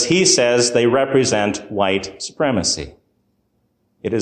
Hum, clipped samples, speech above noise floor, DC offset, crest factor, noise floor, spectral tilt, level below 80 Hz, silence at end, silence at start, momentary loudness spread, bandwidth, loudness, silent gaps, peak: none; under 0.1%; 49 dB; under 0.1%; 16 dB; -66 dBFS; -3 dB/octave; -48 dBFS; 0 s; 0 s; 11 LU; 10 kHz; -17 LUFS; none; -2 dBFS